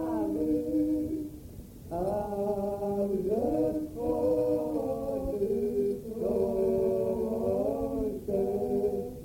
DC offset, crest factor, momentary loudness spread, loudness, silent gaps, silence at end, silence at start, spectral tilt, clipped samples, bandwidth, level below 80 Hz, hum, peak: under 0.1%; 12 dB; 5 LU; -30 LUFS; none; 0 s; 0 s; -8.5 dB/octave; under 0.1%; 17 kHz; -50 dBFS; none; -16 dBFS